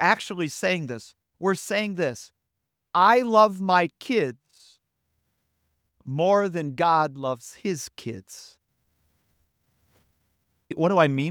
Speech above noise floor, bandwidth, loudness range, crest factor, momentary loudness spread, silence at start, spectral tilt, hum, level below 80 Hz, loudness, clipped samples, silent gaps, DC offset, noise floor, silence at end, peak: 58 dB; 18 kHz; 12 LU; 22 dB; 18 LU; 0 s; -5 dB/octave; none; -72 dBFS; -23 LUFS; under 0.1%; none; under 0.1%; -81 dBFS; 0 s; -4 dBFS